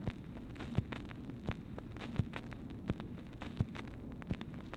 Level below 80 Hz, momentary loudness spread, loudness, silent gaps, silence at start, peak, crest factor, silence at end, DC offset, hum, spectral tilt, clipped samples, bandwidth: -52 dBFS; 8 LU; -44 LUFS; none; 0 s; -20 dBFS; 24 dB; 0 s; under 0.1%; none; -7.5 dB/octave; under 0.1%; 11 kHz